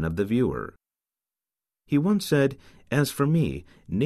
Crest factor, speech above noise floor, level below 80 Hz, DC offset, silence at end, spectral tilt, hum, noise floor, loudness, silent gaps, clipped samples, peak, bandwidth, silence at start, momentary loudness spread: 18 dB; over 66 dB; -50 dBFS; under 0.1%; 0 s; -6.5 dB/octave; none; under -90 dBFS; -25 LUFS; none; under 0.1%; -8 dBFS; 14 kHz; 0 s; 11 LU